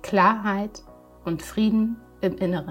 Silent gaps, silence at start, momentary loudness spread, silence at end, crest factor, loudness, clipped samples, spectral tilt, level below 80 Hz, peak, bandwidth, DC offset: none; 0.05 s; 12 LU; 0 s; 18 dB; -24 LUFS; under 0.1%; -6.5 dB/octave; -50 dBFS; -6 dBFS; 16 kHz; under 0.1%